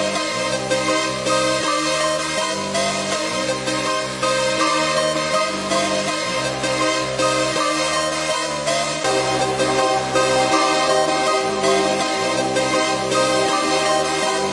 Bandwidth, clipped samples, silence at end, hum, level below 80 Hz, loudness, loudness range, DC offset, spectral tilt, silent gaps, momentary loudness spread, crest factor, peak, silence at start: 11.5 kHz; under 0.1%; 0 s; none; -52 dBFS; -19 LUFS; 2 LU; under 0.1%; -2.5 dB/octave; none; 4 LU; 16 dB; -4 dBFS; 0 s